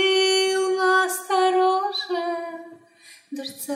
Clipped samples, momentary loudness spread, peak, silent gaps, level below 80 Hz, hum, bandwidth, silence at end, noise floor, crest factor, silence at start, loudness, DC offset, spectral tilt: under 0.1%; 16 LU; -10 dBFS; none; under -90 dBFS; none; 16 kHz; 0 s; -51 dBFS; 14 dB; 0 s; -21 LUFS; under 0.1%; -0.5 dB/octave